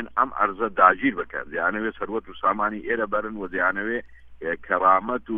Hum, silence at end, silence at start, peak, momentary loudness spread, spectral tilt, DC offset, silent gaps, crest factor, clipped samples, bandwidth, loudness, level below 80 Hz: none; 0 s; 0 s; -2 dBFS; 13 LU; -8.5 dB/octave; under 0.1%; none; 22 dB; under 0.1%; 3.8 kHz; -23 LUFS; -54 dBFS